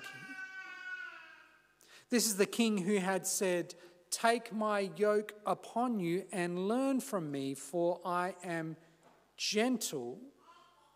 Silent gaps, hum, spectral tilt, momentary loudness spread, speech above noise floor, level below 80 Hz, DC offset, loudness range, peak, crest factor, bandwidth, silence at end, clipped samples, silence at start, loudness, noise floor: none; 50 Hz at -80 dBFS; -4 dB/octave; 14 LU; 32 dB; -88 dBFS; under 0.1%; 4 LU; -14 dBFS; 20 dB; 16 kHz; 0.45 s; under 0.1%; 0 s; -35 LUFS; -66 dBFS